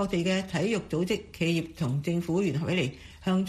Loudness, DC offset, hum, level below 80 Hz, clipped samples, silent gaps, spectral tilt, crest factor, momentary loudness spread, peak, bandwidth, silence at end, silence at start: -29 LUFS; under 0.1%; none; -54 dBFS; under 0.1%; none; -6 dB/octave; 14 dB; 3 LU; -14 dBFS; 13 kHz; 0 s; 0 s